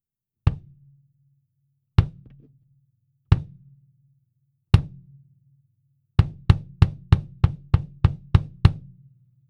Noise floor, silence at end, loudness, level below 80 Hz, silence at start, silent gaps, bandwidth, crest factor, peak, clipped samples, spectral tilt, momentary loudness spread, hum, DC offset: -72 dBFS; 0.7 s; -23 LUFS; -32 dBFS; 0.45 s; none; 6.2 kHz; 24 dB; 0 dBFS; under 0.1%; -8.5 dB/octave; 7 LU; none; under 0.1%